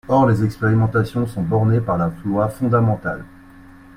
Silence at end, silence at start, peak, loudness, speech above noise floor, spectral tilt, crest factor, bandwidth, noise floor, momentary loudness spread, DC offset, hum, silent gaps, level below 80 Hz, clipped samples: 0.35 s; 0.1 s; -2 dBFS; -19 LUFS; 25 dB; -9 dB/octave; 16 dB; 12 kHz; -43 dBFS; 6 LU; under 0.1%; none; none; -44 dBFS; under 0.1%